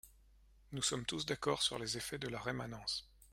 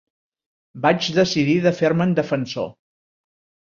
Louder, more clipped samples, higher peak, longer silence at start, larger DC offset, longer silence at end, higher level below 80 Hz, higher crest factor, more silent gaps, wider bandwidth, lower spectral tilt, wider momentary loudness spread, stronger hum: second, -39 LUFS vs -20 LUFS; neither; second, -20 dBFS vs -2 dBFS; second, 0.05 s vs 0.75 s; neither; second, 0.05 s vs 1 s; second, -64 dBFS vs -58 dBFS; about the same, 22 dB vs 20 dB; neither; first, 16.5 kHz vs 7.4 kHz; second, -3 dB/octave vs -6 dB/octave; about the same, 7 LU vs 9 LU; neither